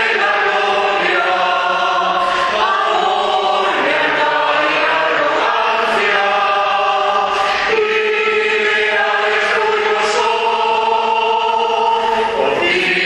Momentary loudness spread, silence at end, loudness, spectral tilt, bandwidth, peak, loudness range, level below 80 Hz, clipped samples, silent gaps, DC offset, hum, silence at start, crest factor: 2 LU; 0 s; -14 LUFS; -2.5 dB/octave; 11.5 kHz; -2 dBFS; 1 LU; -52 dBFS; under 0.1%; none; under 0.1%; none; 0 s; 14 dB